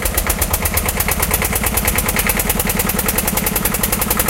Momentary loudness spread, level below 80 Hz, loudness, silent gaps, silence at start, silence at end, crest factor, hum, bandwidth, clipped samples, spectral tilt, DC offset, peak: 1 LU; -24 dBFS; -16 LUFS; none; 0 s; 0 s; 18 dB; none; 17.5 kHz; under 0.1%; -3 dB/octave; under 0.1%; 0 dBFS